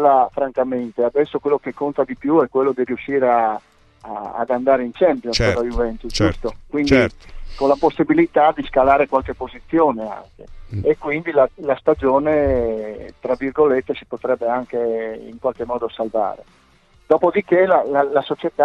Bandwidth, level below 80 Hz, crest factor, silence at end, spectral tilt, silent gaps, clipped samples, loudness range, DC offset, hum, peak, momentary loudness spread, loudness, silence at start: 9.6 kHz; -38 dBFS; 16 dB; 0 s; -6 dB/octave; none; under 0.1%; 4 LU; under 0.1%; none; -2 dBFS; 10 LU; -19 LUFS; 0 s